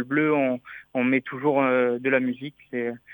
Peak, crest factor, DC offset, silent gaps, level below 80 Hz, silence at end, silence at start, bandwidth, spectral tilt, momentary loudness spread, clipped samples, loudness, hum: -8 dBFS; 16 dB; under 0.1%; none; -74 dBFS; 0 s; 0 s; 19.5 kHz; -9 dB/octave; 11 LU; under 0.1%; -24 LUFS; none